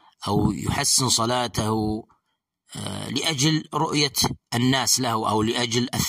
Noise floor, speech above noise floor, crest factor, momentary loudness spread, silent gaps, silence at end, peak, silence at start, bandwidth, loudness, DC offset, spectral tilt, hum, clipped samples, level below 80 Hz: -76 dBFS; 53 dB; 18 dB; 10 LU; none; 0 s; -6 dBFS; 0.2 s; 16 kHz; -22 LUFS; under 0.1%; -3.5 dB/octave; none; under 0.1%; -48 dBFS